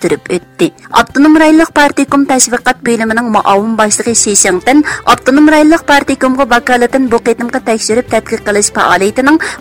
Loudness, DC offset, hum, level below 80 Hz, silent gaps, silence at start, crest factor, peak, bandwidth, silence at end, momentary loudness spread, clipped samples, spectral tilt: -9 LUFS; under 0.1%; none; -40 dBFS; none; 0 s; 8 dB; 0 dBFS; over 20 kHz; 0 s; 7 LU; 0.3%; -3 dB/octave